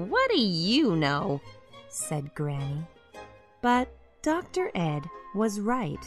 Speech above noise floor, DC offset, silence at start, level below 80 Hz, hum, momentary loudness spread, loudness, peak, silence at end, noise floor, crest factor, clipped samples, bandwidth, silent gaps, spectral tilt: 21 dB; under 0.1%; 0 s; -54 dBFS; none; 14 LU; -28 LUFS; -12 dBFS; 0 s; -48 dBFS; 16 dB; under 0.1%; 13.5 kHz; none; -5 dB/octave